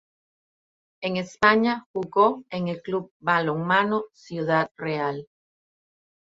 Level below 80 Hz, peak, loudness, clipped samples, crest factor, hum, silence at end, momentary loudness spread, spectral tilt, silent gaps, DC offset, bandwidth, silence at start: -66 dBFS; -4 dBFS; -24 LUFS; under 0.1%; 22 dB; none; 1.05 s; 11 LU; -6.5 dB/octave; 1.86-1.94 s, 3.11-3.20 s, 4.71-4.75 s; under 0.1%; 8 kHz; 1 s